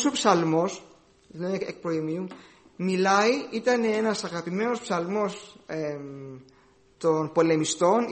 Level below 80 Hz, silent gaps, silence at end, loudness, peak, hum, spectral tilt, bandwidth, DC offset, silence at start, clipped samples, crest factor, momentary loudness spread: -68 dBFS; none; 0 s; -26 LUFS; -6 dBFS; none; -4.5 dB/octave; 8.8 kHz; under 0.1%; 0 s; under 0.1%; 20 dB; 15 LU